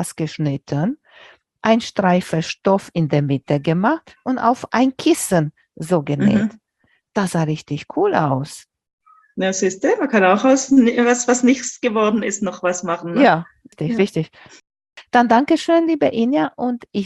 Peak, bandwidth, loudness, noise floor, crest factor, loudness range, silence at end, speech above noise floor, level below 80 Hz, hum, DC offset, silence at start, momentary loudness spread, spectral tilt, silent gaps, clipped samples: -2 dBFS; 12.5 kHz; -18 LUFS; -64 dBFS; 16 dB; 4 LU; 0 s; 46 dB; -60 dBFS; none; under 0.1%; 0 s; 10 LU; -5.5 dB/octave; 8.93-8.98 s; under 0.1%